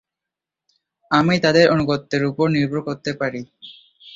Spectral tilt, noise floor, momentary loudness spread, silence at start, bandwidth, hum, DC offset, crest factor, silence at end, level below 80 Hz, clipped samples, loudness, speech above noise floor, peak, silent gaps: -6 dB/octave; -86 dBFS; 12 LU; 1.1 s; 7.8 kHz; none; under 0.1%; 18 dB; 0.05 s; -54 dBFS; under 0.1%; -19 LUFS; 67 dB; -2 dBFS; none